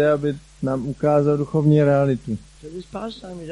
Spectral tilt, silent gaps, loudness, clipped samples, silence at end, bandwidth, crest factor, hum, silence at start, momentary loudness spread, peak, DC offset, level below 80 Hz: -8.5 dB/octave; none; -20 LUFS; under 0.1%; 0 s; 10.5 kHz; 14 dB; none; 0 s; 17 LU; -6 dBFS; under 0.1%; -48 dBFS